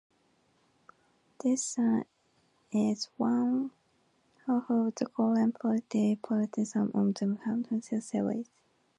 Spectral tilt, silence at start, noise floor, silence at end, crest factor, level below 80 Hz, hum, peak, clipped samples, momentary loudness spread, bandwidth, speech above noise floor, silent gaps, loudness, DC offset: -6 dB/octave; 1.45 s; -71 dBFS; 0.55 s; 16 dB; -78 dBFS; none; -14 dBFS; under 0.1%; 6 LU; 11 kHz; 41 dB; none; -31 LUFS; under 0.1%